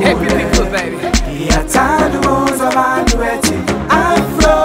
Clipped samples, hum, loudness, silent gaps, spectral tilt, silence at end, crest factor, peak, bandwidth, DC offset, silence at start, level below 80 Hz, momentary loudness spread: under 0.1%; none; -13 LUFS; none; -4.5 dB/octave; 0 s; 12 dB; 0 dBFS; 16.5 kHz; under 0.1%; 0 s; -22 dBFS; 5 LU